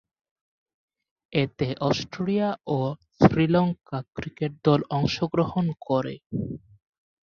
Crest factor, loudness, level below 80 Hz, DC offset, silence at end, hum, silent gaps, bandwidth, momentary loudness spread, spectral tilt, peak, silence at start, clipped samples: 22 dB; -25 LUFS; -52 dBFS; under 0.1%; 0.65 s; none; 6.26-6.30 s; 7 kHz; 12 LU; -7.5 dB/octave; -4 dBFS; 1.3 s; under 0.1%